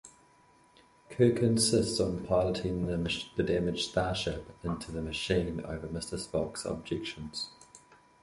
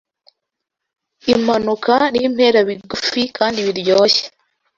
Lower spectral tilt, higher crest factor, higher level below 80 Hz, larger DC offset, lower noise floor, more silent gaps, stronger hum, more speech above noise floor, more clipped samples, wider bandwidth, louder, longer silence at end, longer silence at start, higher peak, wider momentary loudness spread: about the same, -5 dB/octave vs -4 dB/octave; about the same, 20 dB vs 16 dB; about the same, -50 dBFS vs -54 dBFS; neither; second, -62 dBFS vs -80 dBFS; neither; neither; second, 32 dB vs 64 dB; neither; first, 11.5 kHz vs 7.6 kHz; second, -31 LUFS vs -16 LUFS; about the same, 0.45 s vs 0.5 s; second, 0.05 s vs 1.25 s; second, -12 dBFS vs 0 dBFS; first, 12 LU vs 7 LU